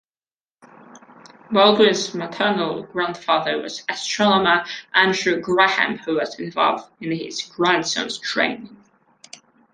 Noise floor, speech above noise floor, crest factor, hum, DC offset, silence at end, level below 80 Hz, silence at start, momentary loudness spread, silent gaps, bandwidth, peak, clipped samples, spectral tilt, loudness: under -90 dBFS; over 70 dB; 20 dB; none; under 0.1%; 1 s; -62 dBFS; 0.95 s; 11 LU; none; 10 kHz; -2 dBFS; under 0.1%; -3.5 dB/octave; -20 LUFS